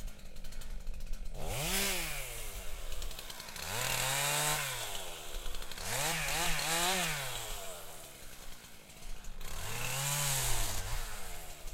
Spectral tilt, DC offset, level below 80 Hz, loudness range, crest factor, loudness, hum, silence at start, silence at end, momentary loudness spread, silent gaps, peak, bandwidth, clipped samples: -1.5 dB/octave; under 0.1%; -42 dBFS; 5 LU; 18 dB; -35 LUFS; none; 0 s; 0 s; 19 LU; none; -18 dBFS; 16.5 kHz; under 0.1%